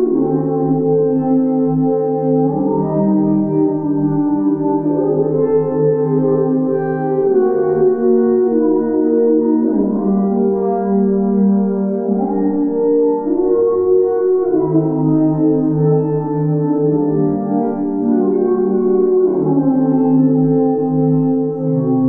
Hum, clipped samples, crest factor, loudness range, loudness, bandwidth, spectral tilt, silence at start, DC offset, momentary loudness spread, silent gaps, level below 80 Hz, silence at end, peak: none; under 0.1%; 10 dB; 1 LU; -15 LUFS; 2.3 kHz; -14.5 dB/octave; 0 s; 0.4%; 3 LU; none; -52 dBFS; 0 s; -4 dBFS